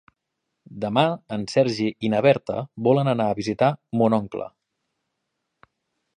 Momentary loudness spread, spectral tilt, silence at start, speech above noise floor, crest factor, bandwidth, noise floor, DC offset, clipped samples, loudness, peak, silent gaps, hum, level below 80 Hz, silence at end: 11 LU; -7 dB/octave; 0.7 s; 58 dB; 22 dB; 10 kHz; -80 dBFS; under 0.1%; under 0.1%; -22 LUFS; -2 dBFS; none; none; -62 dBFS; 1.7 s